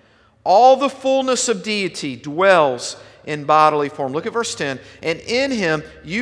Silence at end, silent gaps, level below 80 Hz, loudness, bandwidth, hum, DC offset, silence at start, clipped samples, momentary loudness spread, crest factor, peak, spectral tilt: 0 s; none; -56 dBFS; -18 LUFS; 11 kHz; none; under 0.1%; 0.45 s; under 0.1%; 14 LU; 18 dB; 0 dBFS; -3.5 dB/octave